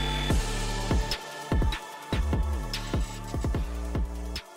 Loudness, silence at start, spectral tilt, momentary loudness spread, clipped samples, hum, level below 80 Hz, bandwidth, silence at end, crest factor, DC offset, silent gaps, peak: -31 LUFS; 0 s; -5 dB/octave; 5 LU; under 0.1%; none; -32 dBFS; 16 kHz; 0 s; 12 dB; under 0.1%; none; -16 dBFS